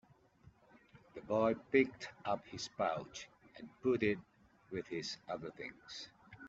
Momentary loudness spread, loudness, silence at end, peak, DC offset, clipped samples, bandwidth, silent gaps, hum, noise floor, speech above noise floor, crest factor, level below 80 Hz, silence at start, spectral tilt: 20 LU; -39 LUFS; 0 s; -18 dBFS; under 0.1%; under 0.1%; 8 kHz; none; none; -66 dBFS; 28 dB; 22 dB; -72 dBFS; 0.45 s; -4 dB/octave